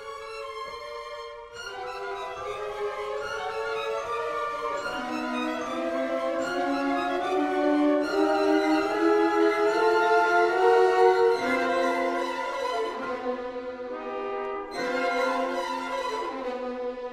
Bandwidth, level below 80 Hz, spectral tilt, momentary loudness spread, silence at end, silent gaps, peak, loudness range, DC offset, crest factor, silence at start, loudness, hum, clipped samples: 15 kHz; -60 dBFS; -3.5 dB/octave; 14 LU; 0 s; none; -8 dBFS; 10 LU; under 0.1%; 18 dB; 0 s; -26 LUFS; none; under 0.1%